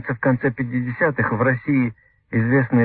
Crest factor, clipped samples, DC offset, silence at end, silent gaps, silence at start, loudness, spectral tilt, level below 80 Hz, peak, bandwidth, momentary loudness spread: 14 dB; under 0.1%; under 0.1%; 0 s; none; 0 s; -21 LUFS; -13.5 dB/octave; -52 dBFS; -6 dBFS; 4.3 kHz; 6 LU